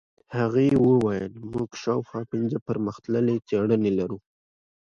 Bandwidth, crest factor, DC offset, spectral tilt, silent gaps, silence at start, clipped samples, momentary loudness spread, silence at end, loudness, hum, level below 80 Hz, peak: 7.6 kHz; 16 dB; under 0.1%; -8 dB/octave; 2.62-2.66 s; 0.3 s; under 0.1%; 12 LU; 0.8 s; -25 LUFS; none; -56 dBFS; -10 dBFS